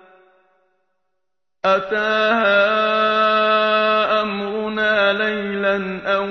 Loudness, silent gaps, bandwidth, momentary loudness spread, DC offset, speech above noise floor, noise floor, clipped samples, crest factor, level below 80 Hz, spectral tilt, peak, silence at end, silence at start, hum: -17 LUFS; none; 6.4 kHz; 7 LU; under 0.1%; 63 dB; -80 dBFS; under 0.1%; 16 dB; -58 dBFS; -5.5 dB/octave; -4 dBFS; 0 s; 1.65 s; none